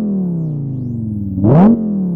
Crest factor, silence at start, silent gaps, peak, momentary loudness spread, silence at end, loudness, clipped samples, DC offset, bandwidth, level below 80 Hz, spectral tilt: 14 dB; 0 s; none; 0 dBFS; 12 LU; 0 s; -14 LUFS; under 0.1%; under 0.1%; 3.4 kHz; -40 dBFS; -12.5 dB/octave